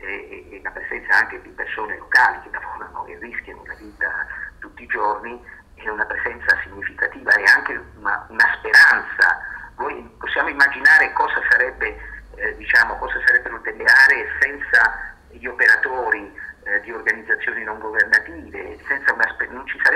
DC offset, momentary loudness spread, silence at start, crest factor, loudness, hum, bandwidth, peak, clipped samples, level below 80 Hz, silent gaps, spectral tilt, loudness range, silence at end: under 0.1%; 20 LU; 0.05 s; 16 dB; -17 LUFS; none; 15.5 kHz; -4 dBFS; under 0.1%; -48 dBFS; none; -2.5 dB/octave; 8 LU; 0 s